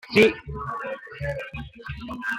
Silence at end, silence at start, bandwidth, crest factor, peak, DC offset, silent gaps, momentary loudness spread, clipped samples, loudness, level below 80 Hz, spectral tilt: 0 s; 0.05 s; 16.5 kHz; 22 dB; -4 dBFS; under 0.1%; none; 18 LU; under 0.1%; -26 LUFS; -46 dBFS; -5.5 dB/octave